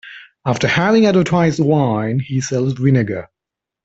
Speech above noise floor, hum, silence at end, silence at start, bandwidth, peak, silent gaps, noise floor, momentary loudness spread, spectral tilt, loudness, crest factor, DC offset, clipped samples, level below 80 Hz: 69 dB; none; 0.6 s; 0.05 s; 8 kHz; -2 dBFS; none; -85 dBFS; 9 LU; -6.5 dB/octave; -16 LUFS; 14 dB; under 0.1%; under 0.1%; -50 dBFS